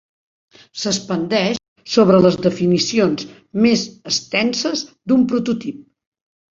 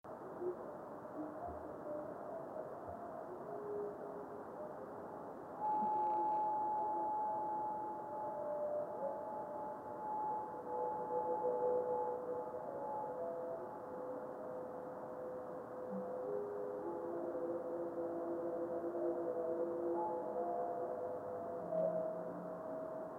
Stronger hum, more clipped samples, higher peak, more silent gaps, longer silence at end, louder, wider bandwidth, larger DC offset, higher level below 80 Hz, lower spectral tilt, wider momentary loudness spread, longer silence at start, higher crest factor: neither; neither; first, -2 dBFS vs -26 dBFS; first, 1.68-1.76 s vs none; first, 0.7 s vs 0 s; first, -18 LUFS vs -42 LUFS; second, 7.8 kHz vs 16 kHz; neither; first, -56 dBFS vs -78 dBFS; second, -5 dB/octave vs -9 dB/octave; about the same, 12 LU vs 10 LU; first, 0.75 s vs 0.05 s; about the same, 18 dB vs 16 dB